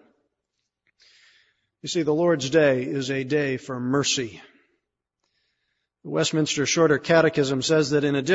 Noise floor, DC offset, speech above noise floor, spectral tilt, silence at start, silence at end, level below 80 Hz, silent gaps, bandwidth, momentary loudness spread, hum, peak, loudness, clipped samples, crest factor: -80 dBFS; under 0.1%; 58 dB; -4.5 dB/octave; 1.85 s; 0 s; -64 dBFS; none; 8 kHz; 9 LU; 60 Hz at -65 dBFS; -6 dBFS; -22 LUFS; under 0.1%; 18 dB